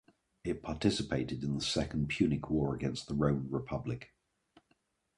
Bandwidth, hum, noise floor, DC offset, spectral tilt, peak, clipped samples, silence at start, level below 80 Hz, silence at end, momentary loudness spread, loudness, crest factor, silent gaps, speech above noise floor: 11.5 kHz; none; -76 dBFS; under 0.1%; -6 dB/octave; -14 dBFS; under 0.1%; 0.45 s; -52 dBFS; 1.1 s; 8 LU; -34 LUFS; 20 dB; none; 42 dB